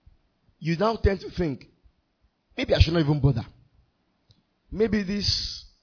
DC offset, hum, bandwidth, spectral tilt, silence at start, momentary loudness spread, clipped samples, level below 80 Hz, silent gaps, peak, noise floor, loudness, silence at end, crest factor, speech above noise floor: under 0.1%; none; 5.4 kHz; -6 dB/octave; 0.6 s; 15 LU; under 0.1%; -36 dBFS; none; -4 dBFS; -69 dBFS; -25 LUFS; 0.15 s; 22 dB; 46 dB